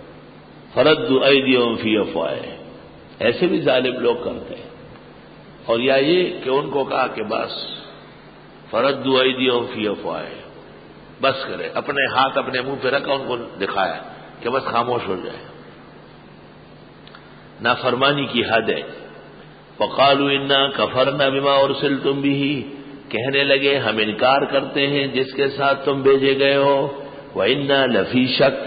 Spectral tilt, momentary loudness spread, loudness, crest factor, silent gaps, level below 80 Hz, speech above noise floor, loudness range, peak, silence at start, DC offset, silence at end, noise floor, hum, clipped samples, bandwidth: -10 dB/octave; 14 LU; -19 LUFS; 18 dB; none; -56 dBFS; 24 dB; 6 LU; -4 dBFS; 0 s; under 0.1%; 0 s; -43 dBFS; none; under 0.1%; 5 kHz